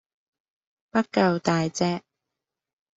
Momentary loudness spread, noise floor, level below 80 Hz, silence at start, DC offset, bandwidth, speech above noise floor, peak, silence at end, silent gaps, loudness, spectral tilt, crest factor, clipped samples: 6 LU; -86 dBFS; -66 dBFS; 0.95 s; under 0.1%; 8 kHz; 63 dB; -6 dBFS; 1 s; none; -25 LUFS; -5.5 dB/octave; 20 dB; under 0.1%